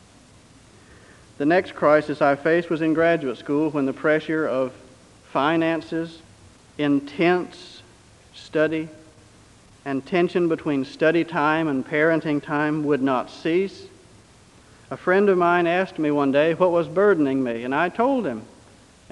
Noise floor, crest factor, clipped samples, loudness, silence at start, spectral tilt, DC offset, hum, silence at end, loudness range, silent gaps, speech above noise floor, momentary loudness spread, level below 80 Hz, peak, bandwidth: -51 dBFS; 18 dB; under 0.1%; -22 LUFS; 1.4 s; -7 dB/octave; under 0.1%; none; 0.65 s; 6 LU; none; 30 dB; 11 LU; -60 dBFS; -4 dBFS; 11 kHz